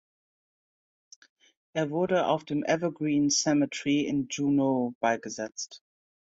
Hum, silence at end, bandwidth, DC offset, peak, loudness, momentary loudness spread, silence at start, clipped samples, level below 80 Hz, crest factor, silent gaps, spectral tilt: none; 0.55 s; 8 kHz; under 0.1%; -12 dBFS; -28 LUFS; 12 LU; 1.75 s; under 0.1%; -70 dBFS; 18 dB; 4.95-5.01 s; -4.5 dB/octave